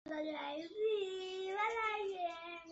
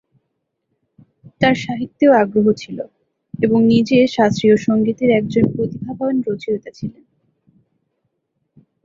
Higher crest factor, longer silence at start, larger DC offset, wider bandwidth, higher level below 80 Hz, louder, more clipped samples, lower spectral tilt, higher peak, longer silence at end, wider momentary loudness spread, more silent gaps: about the same, 16 dB vs 16 dB; second, 0.05 s vs 1.4 s; neither; about the same, 8 kHz vs 7.4 kHz; second, -78 dBFS vs -52 dBFS; second, -40 LUFS vs -16 LUFS; neither; second, 0 dB/octave vs -7 dB/octave; second, -24 dBFS vs -2 dBFS; second, 0 s vs 1.95 s; second, 7 LU vs 17 LU; neither